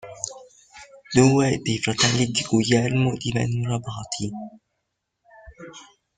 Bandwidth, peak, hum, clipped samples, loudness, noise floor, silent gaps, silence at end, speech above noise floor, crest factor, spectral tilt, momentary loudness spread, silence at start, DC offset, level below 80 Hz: 9.6 kHz; -2 dBFS; none; under 0.1%; -22 LUFS; -78 dBFS; none; 0.35 s; 56 dB; 22 dB; -4.5 dB/octave; 19 LU; 0.05 s; under 0.1%; -54 dBFS